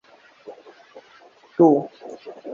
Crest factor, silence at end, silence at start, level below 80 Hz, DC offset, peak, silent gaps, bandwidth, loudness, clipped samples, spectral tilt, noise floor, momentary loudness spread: 20 dB; 0 s; 0.5 s; -72 dBFS; under 0.1%; -4 dBFS; none; 6.8 kHz; -19 LUFS; under 0.1%; -9 dB/octave; -51 dBFS; 27 LU